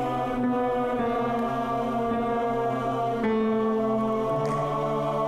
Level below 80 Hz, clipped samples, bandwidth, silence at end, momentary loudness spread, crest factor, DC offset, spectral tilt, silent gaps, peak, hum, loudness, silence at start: -50 dBFS; under 0.1%; 13 kHz; 0 s; 2 LU; 12 dB; under 0.1%; -7.5 dB/octave; none; -14 dBFS; none; -26 LUFS; 0 s